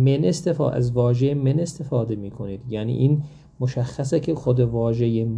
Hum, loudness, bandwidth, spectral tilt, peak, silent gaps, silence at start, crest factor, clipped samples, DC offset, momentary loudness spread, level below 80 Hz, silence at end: none; -22 LUFS; 10.5 kHz; -8 dB/octave; -6 dBFS; none; 0 s; 14 dB; under 0.1%; under 0.1%; 8 LU; -48 dBFS; 0 s